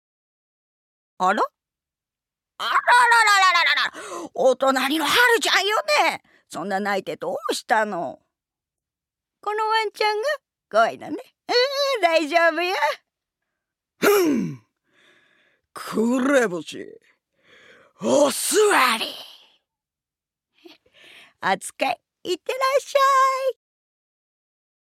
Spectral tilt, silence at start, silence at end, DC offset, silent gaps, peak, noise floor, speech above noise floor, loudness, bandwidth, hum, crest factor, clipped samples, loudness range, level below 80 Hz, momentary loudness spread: -2 dB/octave; 1.2 s; 1.3 s; under 0.1%; none; -4 dBFS; -90 dBFS; 69 dB; -20 LUFS; 16.5 kHz; none; 20 dB; under 0.1%; 8 LU; -76 dBFS; 16 LU